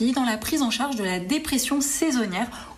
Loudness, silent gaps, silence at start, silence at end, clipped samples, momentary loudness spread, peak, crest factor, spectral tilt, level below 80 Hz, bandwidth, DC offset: -24 LUFS; none; 0 s; 0 s; under 0.1%; 4 LU; -10 dBFS; 14 dB; -3 dB/octave; -50 dBFS; 15 kHz; under 0.1%